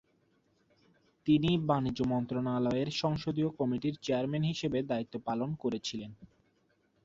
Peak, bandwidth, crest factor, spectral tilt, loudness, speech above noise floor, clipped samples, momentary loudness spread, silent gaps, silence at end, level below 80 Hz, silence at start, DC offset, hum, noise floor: -14 dBFS; 7.8 kHz; 18 dB; -6.5 dB/octave; -32 LUFS; 41 dB; under 0.1%; 7 LU; none; 0.8 s; -60 dBFS; 1.25 s; under 0.1%; none; -72 dBFS